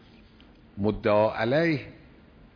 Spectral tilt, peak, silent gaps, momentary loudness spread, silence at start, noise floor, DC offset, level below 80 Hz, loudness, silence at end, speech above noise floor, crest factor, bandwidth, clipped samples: -8.5 dB/octave; -10 dBFS; none; 17 LU; 0.75 s; -53 dBFS; under 0.1%; -52 dBFS; -25 LUFS; 0.65 s; 29 dB; 18 dB; 5.4 kHz; under 0.1%